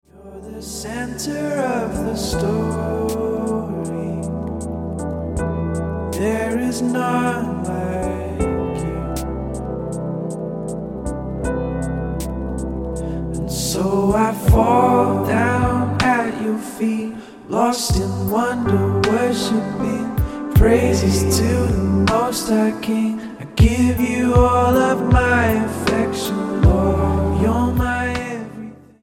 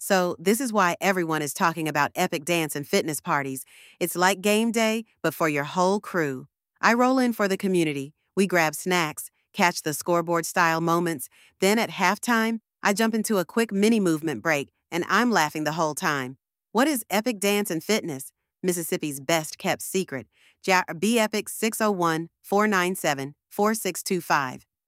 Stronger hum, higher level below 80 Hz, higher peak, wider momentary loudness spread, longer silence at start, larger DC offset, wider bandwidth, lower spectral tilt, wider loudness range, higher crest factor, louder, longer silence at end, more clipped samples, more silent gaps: neither; first, -28 dBFS vs -72 dBFS; about the same, -2 dBFS vs -4 dBFS; about the same, 11 LU vs 9 LU; first, 0.15 s vs 0 s; neither; about the same, 16.5 kHz vs 16 kHz; first, -6 dB/octave vs -4 dB/octave; first, 8 LU vs 2 LU; about the same, 18 dB vs 22 dB; first, -19 LUFS vs -24 LUFS; about the same, 0.25 s vs 0.3 s; neither; neither